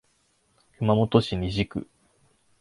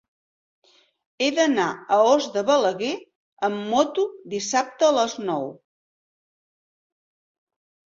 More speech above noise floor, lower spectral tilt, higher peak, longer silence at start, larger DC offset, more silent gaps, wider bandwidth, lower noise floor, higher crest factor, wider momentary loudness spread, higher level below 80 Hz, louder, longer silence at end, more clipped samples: second, 44 dB vs over 68 dB; first, -7.5 dB/octave vs -3 dB/octave; about the same, -4 dBFS vs -6 dBFS; second, 0.8 s vs 1.2 s; neither; second, none vs 3.15-3.37 s; first, 11.5 kHz vs 7.8 kHz; second, -68 dBFS vs under -90 dBFS; about the same, 22 dB vs 20 dB; about the same, 10 LU vs 10 LU; first, -46 dBFS vs -70 dBFS; second, -25 LUFS vs -22 LUFS; second, 0.8 s vs 2.4 s; neither